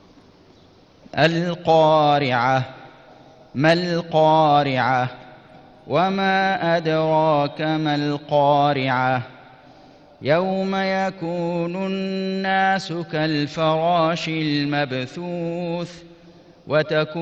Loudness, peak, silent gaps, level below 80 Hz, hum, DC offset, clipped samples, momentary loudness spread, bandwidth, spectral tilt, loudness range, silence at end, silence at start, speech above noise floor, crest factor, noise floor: -20 LUFS; -4 dBFS; none; -58 dBFS; none; under 0.1%; under 0.1%; 10 LU; 8.4 kHz; -6.5 dB/octave; 4 LU; 0 s; 1.15 s; 31 dB; 16 dB; -51 dBFS